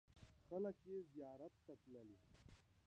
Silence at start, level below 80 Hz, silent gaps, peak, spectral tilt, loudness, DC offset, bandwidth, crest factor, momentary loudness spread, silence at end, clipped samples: 0.1 s; -78 dBFS; none; -36 dBFS; -8 dB/octave; -54 LUFS; under 0.1%; 9.4 kHz; 18 dB; 20 LU; 0.05 s; under 0.1%